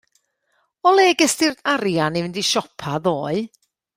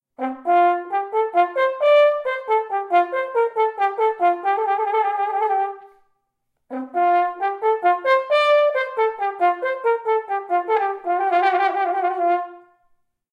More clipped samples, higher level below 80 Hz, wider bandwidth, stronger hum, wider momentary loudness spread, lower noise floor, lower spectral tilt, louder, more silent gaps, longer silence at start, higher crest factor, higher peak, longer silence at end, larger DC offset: neither; first, -60 dBFS vs -80 dBFS; first, 16 kHz vs 8.8 kHz; neither; first, 11 LU vs 7 LU; second, -68 dBFS vs -74 dBFS; about the same, -3.5 dB/octave vs -3 dB/octave; about the same, -19 LUFS vs -20 LUFS; neither; first, 0.85 s vs 0.2 s; about the same, 18 dB vs 14 dB; first, -2 dBFS vs -6 dBFS; second, 0.5 s vs 0.75 s; neither